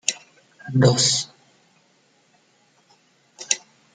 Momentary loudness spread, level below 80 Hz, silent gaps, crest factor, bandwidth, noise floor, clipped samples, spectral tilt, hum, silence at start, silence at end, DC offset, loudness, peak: 23 LU; -64 dBFS; none; 24 dB; 9.6 kHz; -61 dBFS; under 0.1%; -3.5 dB/octave; none; 0.1 s; 0.35 s; under 0.1%; -20 LUFS; 0 dBFS